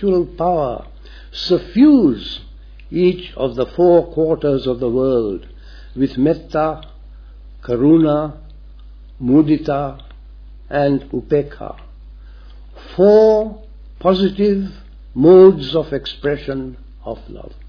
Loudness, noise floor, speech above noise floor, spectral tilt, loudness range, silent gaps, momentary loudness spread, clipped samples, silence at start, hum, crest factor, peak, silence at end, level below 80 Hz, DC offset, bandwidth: -15 LUFS; -37 dBFS; 22 dB; -8.5 dB/octave; 6 LU; none; 21 LU; under 0.1%; 0 s; none; 16 dB; 0 dBFS; 0 s; -38 dBFS; under 0.1%; 5.4 kHz